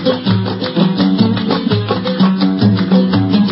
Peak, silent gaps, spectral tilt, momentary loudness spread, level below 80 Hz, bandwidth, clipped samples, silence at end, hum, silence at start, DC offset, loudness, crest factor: 0 dBFS; none; -11.5 dB/octave; 4 LU; -44 dBFS; 5.8 kHz; under 0.1%; 0 s; none; 0 s; under 0.1%; -13 LUFS; 12 dB